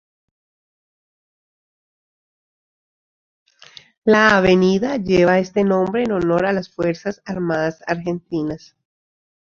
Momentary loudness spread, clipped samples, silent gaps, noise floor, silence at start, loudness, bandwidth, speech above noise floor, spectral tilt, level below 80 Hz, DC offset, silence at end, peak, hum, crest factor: 12 LU; under 0.1%; none; -46 dBFS; 4.05 s; -18 LUFS; 7.4 kHz; 29 dB; -6.5 dB/octave; -52 dBFS; under 0.1%; 1 s; -2 dBFS; none; 20 dB